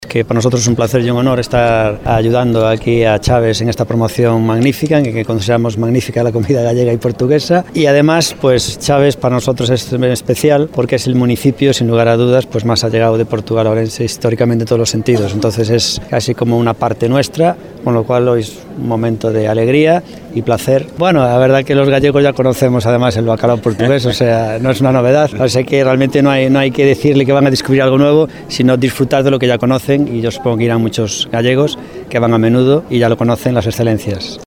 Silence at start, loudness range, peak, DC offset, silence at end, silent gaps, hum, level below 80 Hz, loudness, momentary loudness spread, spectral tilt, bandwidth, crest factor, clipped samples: 0 s; 3 LU; 0 dBFS; under 0.1%; 0 s; none; none; -38 dBFS; -12 LUFS; 5 LU; -6 dB/octave; 17 kHz; 12 dB; under 0.1%